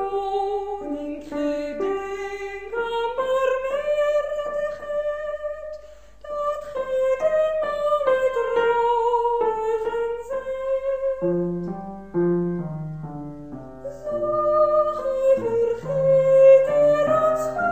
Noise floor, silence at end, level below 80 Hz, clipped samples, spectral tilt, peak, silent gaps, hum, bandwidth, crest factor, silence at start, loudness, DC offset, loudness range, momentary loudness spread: -45 dBFS; 0 s; -52 dBFS; under 0.1%; -7 dB/octave; -6 dBFS; none; none; 15.5 kHz; 16 dB; 0 s; -22 LUFS; 0.4%; 8 LU; 13 LU